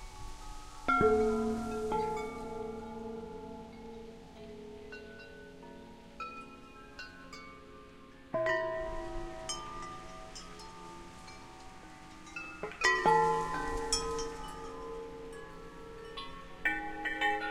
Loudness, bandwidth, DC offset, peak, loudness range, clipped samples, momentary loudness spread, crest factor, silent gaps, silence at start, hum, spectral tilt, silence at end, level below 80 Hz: -34 LUFS; 16 kHz; under 0.1%; -14 dBFS; 16 LU; under 0.1%; 22 LU; 22 dB; none; 0 s; none; -3.5 dB/octave; 0 s; -52 dBFS